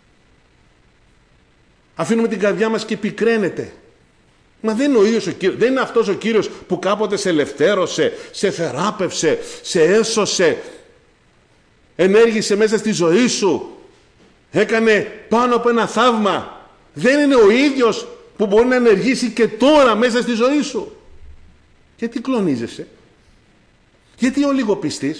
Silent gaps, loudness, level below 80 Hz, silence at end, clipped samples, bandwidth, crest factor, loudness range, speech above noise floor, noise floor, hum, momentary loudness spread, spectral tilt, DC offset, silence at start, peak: none; -16 LUFS; -52 dBFS; 0 s; under 0.1%; 10.5 kHz; 12 dB; 7 LU; 38 dB; -54 dBFS; none; 12 LU; -4.5 dB/octave; under 0.1%; 2 s; -4 dBFS